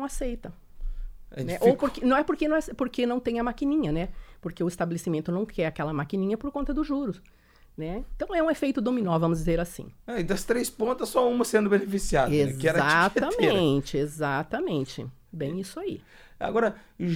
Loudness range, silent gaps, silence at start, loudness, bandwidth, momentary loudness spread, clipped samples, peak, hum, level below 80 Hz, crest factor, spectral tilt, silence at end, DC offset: 6 LU; none; 0 s; -27 LUFS; 17 kHz; 14 LU; under 0.1%; -8 dBFS; none; -42 dBFS; 18 dB; -5.5 dB/octave; 0 s; under 0.1%